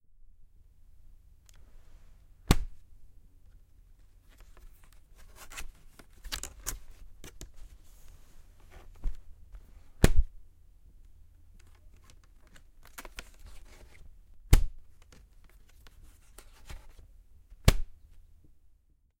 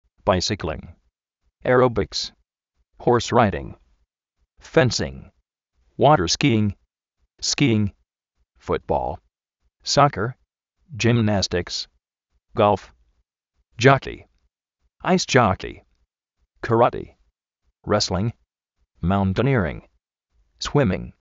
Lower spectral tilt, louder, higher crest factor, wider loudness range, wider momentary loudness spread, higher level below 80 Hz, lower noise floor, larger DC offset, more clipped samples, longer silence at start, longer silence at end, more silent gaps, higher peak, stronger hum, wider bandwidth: about the same, -4.5 dB/octave vs -4.5 dB/octave; second, -33 LUFS vs -21 LUFS; first, 30 dB vs 22 dB; first, 17 LU vs 3 LU; first, 30 LU vs 17 LU; first, -36 dBFS vs -46 dBFS; second, -64 dBFS vs -73 dBFS; neither; neither; first, 2.5 s vs 0.25 s; first, 1.3 s vs 0.1 s; neither; about the same, -4 dBFS vs -2 dBFS; neither; first, 16.5 kHz vs 8 kHz